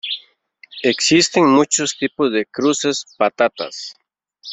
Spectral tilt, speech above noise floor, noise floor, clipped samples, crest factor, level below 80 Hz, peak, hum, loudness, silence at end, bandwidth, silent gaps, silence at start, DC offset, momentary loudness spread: -3 dB/octave; 33 dB; -50 dBFS; under 0.1%; 16 dB; -62 dBFS; -2 dBFS; none; -17 LUFS; 0 s; 8.4 kHz; none; 0.05 s; under 0.1%; 15 LU